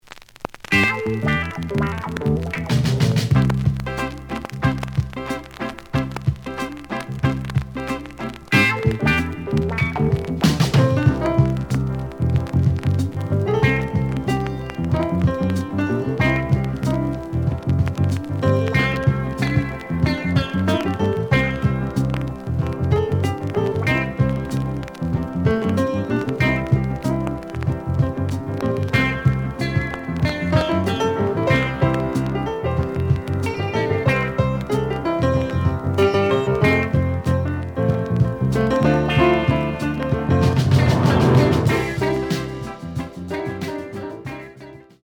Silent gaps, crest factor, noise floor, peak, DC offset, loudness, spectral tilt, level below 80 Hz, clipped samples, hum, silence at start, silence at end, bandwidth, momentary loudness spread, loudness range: none; 18 dB; -41 dBFS; -2 dBFS; under 0.1%; -21 LUFS; -7 dB/octave; -36 dBFS; under 0.1%; none; 0.1 s; 0.25 s; 17 kHz; 10 LU; 4 LU